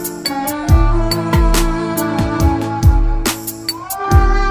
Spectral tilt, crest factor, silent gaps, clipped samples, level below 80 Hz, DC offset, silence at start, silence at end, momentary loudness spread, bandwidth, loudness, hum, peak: -5 dB/octave; 14 dB; none; under 0.1%; -16 dBFS; under 0.1%; 0 s; 0 s; 8 LU; 16 kHz; -16 LUFS; none; 0 dBFS